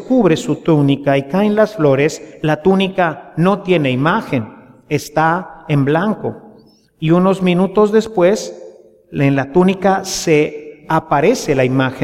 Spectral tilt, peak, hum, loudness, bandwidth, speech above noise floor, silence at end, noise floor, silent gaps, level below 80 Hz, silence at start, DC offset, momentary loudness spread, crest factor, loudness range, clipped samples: -6 dB/octave; -2 dBFS; none; -15 LUFS; 15.5 kHz; 32 dB; 0 s; -47 dBFS; none; -48 dBFS; 0 s; under 0.1%; 8 LU; 14 dB; 3 LU; under 0.1%